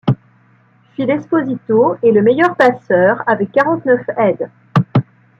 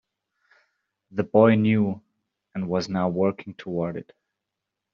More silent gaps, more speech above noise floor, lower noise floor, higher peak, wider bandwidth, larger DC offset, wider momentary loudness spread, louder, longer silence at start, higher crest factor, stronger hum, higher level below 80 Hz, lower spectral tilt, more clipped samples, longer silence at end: neither; second, 38 dB vs 62 dB; second, -51 dBFS vs -84 dBFS; about the same, -2 dBFS vs -4 dBFS; about the same, 7.6 kHz vs 7 kHz; neither; second, 8 LU vs 19 LU; first, -14 LUFS vs -23 LUFS; second, 0.05 s vs 1.15 s; second, 14 dB vs 22 dB; neither; first, -56 dBFS vs -66 dBFS; first, -8.5 dB/octave vs -7 dB/octave; neither; second, 0.35 s vs 0.9 s